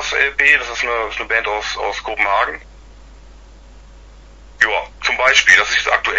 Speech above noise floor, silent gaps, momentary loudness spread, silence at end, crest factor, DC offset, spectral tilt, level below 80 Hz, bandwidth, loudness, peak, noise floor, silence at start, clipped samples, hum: 24 dB; none; 11 LU; 0 s; 18 dB; under 0.1%; -0.5 dB/octave; -40 dBFS; 11 kHz; -15 LUFS; 0 dBFS; -40 dBFS; 0 s; under 0.1%; none